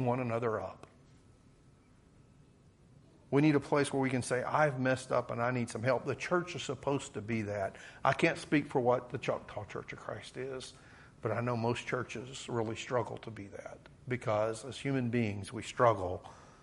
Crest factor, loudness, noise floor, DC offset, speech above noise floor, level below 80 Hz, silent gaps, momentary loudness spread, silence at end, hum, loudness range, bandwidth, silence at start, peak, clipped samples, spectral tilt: 22 dB; -34 LUFS; -62 dBFS; under 0.1%; 29 dB; -66 dBFS; none; 14 LU; 0.1 s; none; 6 LU; 11.5 kHz; 0 s; -12 dBFS; under 0.1%; -6 dB/octave